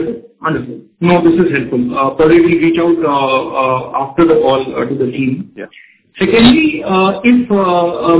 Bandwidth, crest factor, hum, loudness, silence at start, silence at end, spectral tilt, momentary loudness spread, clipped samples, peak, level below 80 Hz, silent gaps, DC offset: 4 kHz; 12 dB; none; -12 LUFS; 0 s; 0 s; -10.5 dB/octave; 11 LU; under 0.1%; 0 dBFS; -42 dBFS; none; under 0.1%